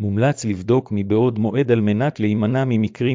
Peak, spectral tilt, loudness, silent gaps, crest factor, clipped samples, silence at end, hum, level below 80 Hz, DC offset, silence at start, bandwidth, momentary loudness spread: -4 dBFS; -7.5 dB/octave; -19 LUFS; none; 14 dB; under 0.1%; 0 s; none; -48 dBFS; under 0.1%; 0 s; 7.6 kHz; 3 LU